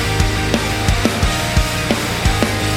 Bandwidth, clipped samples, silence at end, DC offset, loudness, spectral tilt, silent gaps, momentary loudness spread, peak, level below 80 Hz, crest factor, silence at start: 17 kHz; under 0.1%; 0 s; under 0.1%; -17 LUFS; -4.5 dB/octave; none; 1 LU; 0 dBFS; -22 dBFS; 16 dB; 0 s